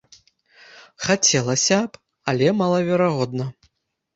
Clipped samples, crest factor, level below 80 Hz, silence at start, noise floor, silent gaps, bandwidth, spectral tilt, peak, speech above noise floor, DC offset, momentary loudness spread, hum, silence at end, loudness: under 0.1%; 20 dB; -60 dBFS; 0.75 s; -68 dBFS; none; 8 kHz; -4 dB/octave; -2 dBFS; 48 dB; under 0.1%; 13 LU; none; 0.65 s; -20 LUFS